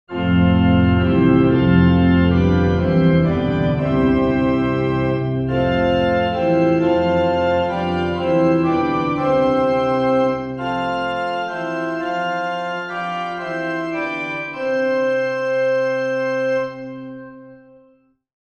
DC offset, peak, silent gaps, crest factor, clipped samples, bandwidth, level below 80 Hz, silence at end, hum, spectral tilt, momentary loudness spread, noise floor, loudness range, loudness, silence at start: under 0.1%; -2 dBFS; none; 16 dB; under 0.1%; 6.8 kHz; -38 dBFS; 1 s; none; -8.5 dB/octave; 9 LU; -56 dBFS; 8 LU; -18 LUFS; 0.1 s